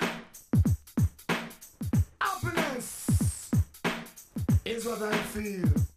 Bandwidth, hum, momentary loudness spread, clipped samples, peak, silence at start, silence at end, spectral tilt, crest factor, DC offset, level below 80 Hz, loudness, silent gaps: 15.5 kHz; none; 7 LU; under 0.1%; -14 dBFS; 0 s; 0.1 s; -5.5 dB/octave; 16 dB; under 0.1%; -40 dBFS; -30 LUFS; none